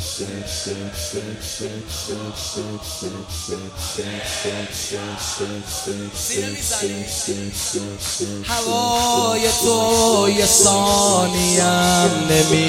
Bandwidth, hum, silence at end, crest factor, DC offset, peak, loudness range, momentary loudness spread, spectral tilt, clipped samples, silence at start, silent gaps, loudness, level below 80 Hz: 16.5 kHz; none; 0 s; 18 dB; under 0.1%; -2 dBFS; 13 LU; 13 LU; -3 dB/octave; under 0.1%; 0 s; none; -19 LUFS; -40 dBFS